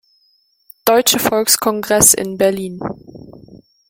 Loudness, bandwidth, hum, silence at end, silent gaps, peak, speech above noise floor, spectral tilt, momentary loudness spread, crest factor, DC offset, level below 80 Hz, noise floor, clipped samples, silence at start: -13 LUFS; 17 kHz; none; 0.35 s; none; 0 dBFS; 44 dB; -2 dB/octave; 17 LU; 18 dB; under 0.1%; -50 dBFS; -59 dBFS; under 0.1%; 0.85 s